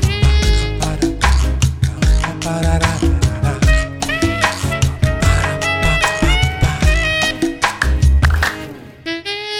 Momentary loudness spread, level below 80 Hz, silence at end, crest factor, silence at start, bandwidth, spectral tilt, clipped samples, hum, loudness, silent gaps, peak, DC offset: 6 LU; -18 dBFS; 0 s; 12 dB; 0 s; 15.5 kHz; -4.5 dB/octave; under 0.1%; none; -16 LUFS; none; -2 dBFS; under 0.1%